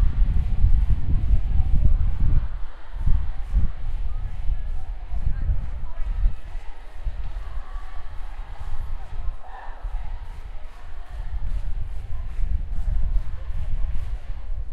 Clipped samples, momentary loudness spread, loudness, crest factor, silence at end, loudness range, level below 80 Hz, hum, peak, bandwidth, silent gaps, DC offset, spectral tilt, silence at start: under 0.1%; 16 LU; -30 LUFS; 16 dB; 0 s; 12 LU; -24 dBFS; none; -4 dBFS; 3.5 kHz; none; under 0.1%; -8 dB/octave; 0 s